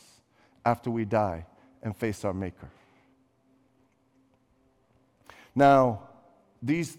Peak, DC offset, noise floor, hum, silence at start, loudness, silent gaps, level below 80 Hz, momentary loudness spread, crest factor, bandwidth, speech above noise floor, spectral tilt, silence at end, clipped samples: -8 dBFS; under 0.1%; -67 dBFS; none; 0.65 s; -27 LUFS; none; -62 dBFS; 19 LU; 22 dB; 15.5 kHz; 41 dB; -7 dB/octave; 0.05 s; under 0.1%